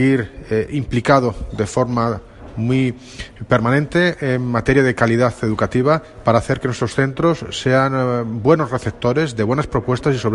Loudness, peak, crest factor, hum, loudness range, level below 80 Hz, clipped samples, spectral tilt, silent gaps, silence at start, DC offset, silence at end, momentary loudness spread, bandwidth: -18 LUFS; 0 dBFS; 16 dB; none; 2 LU; -38 dBFS; under 0.1%; -6.5 dB/octave; none; 0 s; under 0.1%; 0 s; 7 LU; 11.5 kHz